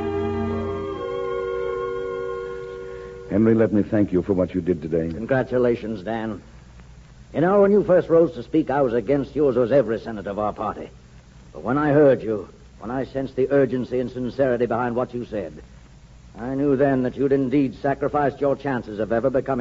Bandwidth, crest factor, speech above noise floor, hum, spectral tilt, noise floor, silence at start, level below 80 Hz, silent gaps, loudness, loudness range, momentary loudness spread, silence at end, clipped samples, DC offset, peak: 7.8 kHz; 16 dB; 25 dB; none; -9 dB/octave; -46 dBFS; 0 s; -46 dBFS; none; -22 LUFS; 4 LU; 13 LU; 0 s; under 0.1%; under 0.1%; -6 dBFS